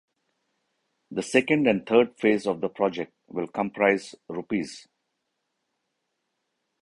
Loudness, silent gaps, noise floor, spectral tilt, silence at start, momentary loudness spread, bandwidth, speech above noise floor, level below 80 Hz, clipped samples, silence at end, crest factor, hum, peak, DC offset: -25 LUFS; none; -79 dBFS; -5.5 dB/octave; 1.1 s; 15 LU; 11.5 kHz; 54 dB; -66 dBFS; under 0.1%; 2.05 s; 22 dB; none; -4 dBFS; under 0.1%